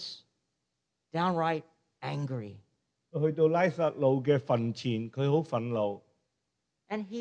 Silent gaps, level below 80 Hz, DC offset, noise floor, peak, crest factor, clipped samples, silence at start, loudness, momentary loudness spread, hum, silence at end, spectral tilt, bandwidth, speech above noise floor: none; -76 dBFS; under 0.1%; -84 dBFS; -14 dBFS; 18 dB; under 0.1%; 0 s; -30 LUFS; 14 LU; none; 0 s; -7.5 dB/octave; 8.8 kHz; 54 dB